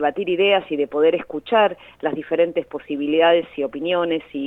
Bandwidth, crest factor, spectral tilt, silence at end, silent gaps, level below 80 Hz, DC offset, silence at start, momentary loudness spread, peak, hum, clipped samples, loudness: 4.1 kHz; 16 dB; -7 dB/octave; 0 s; none; -60 dBFS; under 0.1%; 0 s; 9 LU; -4 dBFS; none; under 0.1%; -20 LUFS